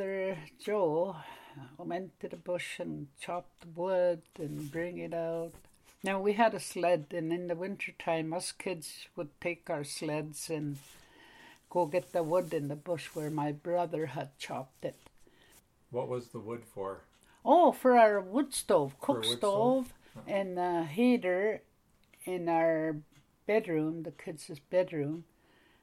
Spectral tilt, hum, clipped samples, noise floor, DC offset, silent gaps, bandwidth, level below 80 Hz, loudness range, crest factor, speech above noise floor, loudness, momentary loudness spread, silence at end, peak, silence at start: -5 dB/octave; none; under 0.1%; -66 dBFS; under 0.1%; none; 16 kHz; -70 dBFS; 10 LU; 22 dB; 34 dB; -33 LUFS; 15 LU; 0.6 s; -12 dBFS; 0 s